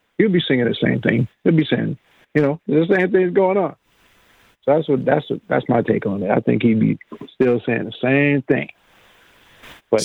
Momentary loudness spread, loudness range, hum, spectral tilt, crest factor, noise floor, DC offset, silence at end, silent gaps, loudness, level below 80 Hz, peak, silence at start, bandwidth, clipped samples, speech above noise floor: 7 LU; 2 LU; none; -7 dB/octave; 18 dB; -56 dBFS; under 0.1%; 0 s; none; -19 LUFS; -58 dBFS; 0 dBFS; 0.2 s; 10.5 kHz; under 0.1%; 38 dB